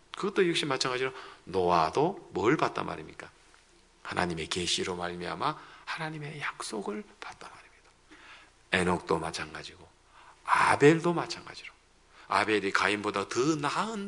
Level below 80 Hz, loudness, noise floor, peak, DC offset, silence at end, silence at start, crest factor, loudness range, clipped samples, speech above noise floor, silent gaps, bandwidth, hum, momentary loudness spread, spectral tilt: -64 dBFS; -29 LUFS; -61 dBFS; -8 dBFS; under 0.1%; 0 s; 0.15 s; 22 dB; 8 LU; under 0.1%; 31 dB; none; 11 kHz; 60 Hz at -75 dBFS; 19 LU; -4.5 dB/octave